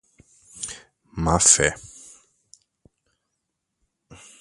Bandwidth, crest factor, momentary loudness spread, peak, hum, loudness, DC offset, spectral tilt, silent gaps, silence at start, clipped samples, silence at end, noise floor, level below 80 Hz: 11.5 kHz; 26 dB; 26 LU; 0 dBFS; none; -17 LUFS; under 0.1%; -2.5 dB/octave; none; 0.55 s; under 0.1%; 0.25 s; -79 dBFS; -44 dBFS